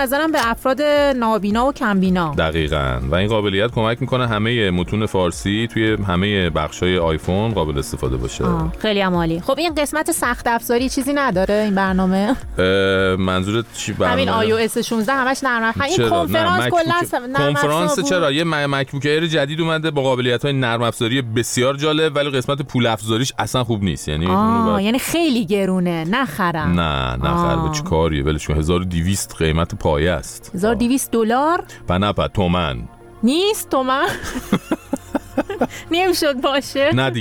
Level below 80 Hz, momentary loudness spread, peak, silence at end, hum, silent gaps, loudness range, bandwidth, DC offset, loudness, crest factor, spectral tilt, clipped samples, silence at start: -34 dBFS; 5 LU; -2 dBFS; 0 s; none; none; 2 LU; 19.5 kHz; under 0.1%; -18 LUFS; 16 dB; -5 dB/octave; under 0.1%; 0 s